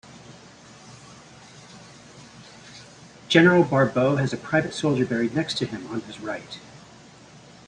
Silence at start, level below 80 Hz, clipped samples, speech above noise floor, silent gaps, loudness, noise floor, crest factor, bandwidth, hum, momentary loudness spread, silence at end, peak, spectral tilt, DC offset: 0.1 s; -60 dBFS; under 0.1%; 26 dB; none; -22 LUFS; -48 dBFS; 22 dB; 10.5 kHz; none; 28 LU; 0.9 s; -2 dBFS; -6 dB/octave; under 0.1%